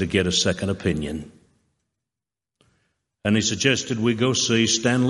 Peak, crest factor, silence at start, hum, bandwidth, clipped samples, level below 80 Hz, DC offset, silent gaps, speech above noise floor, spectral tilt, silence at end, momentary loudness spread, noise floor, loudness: -2 dBFS; 20 dB; 0 s; none; 11.5 kHz; under 0.1%; -52 dBFS; under 0.1%; none; 67 dB; -4 dB/octave; 0 s; 9 LU; -89 dBFS; -21 LUFS